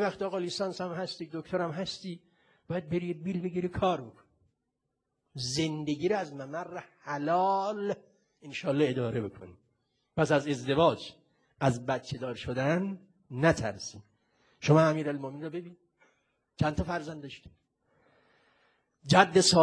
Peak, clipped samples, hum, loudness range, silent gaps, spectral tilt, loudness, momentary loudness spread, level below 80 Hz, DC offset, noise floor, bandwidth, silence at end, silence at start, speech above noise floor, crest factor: -6 dBFS; under 0.1%; none; 6 LU; none; -5 dB/octave; -30 LUFS; 17 LU; -58 dBFS; under 0.1%; -83 dBFS; 11 kHz; 0 s; 0 s; 53 dB; 26 dB